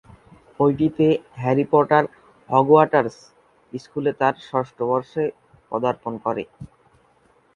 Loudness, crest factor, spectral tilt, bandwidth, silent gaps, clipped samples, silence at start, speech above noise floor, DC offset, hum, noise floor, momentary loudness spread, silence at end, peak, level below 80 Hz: -21 LUFS; 22 dB; -8 dB/octave; 7.2 kHz; none; under 0.1%; 0.6 s; 39 dB; under 0.1%; none; -59 dBFS; 15 LU; 0.9 s; 0 dBFS; -58 dBFS